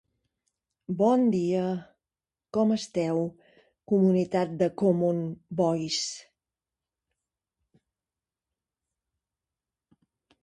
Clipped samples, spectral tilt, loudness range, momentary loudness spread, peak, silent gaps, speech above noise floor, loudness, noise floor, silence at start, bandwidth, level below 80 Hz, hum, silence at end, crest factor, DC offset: under 0.1%; -6 dB/octave; 7 LU; 11 LU; -10 dBFS; none; over 64 dB; -27 LUFS; under -90 dBFS; 0.9 s; 11 kHz; -68 dBFS; none; 4.25 s; 18 dB; under 0.1%